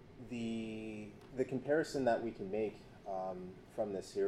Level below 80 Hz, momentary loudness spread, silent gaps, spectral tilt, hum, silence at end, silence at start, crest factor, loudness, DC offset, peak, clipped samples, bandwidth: -66 dBFS; 13 LU; none; -6 dB/octave; none; 0 s; 0 s; 18 dB; -40 LUFS; under 0.1%; -22 dBFS; under 0.1%; 13 kHz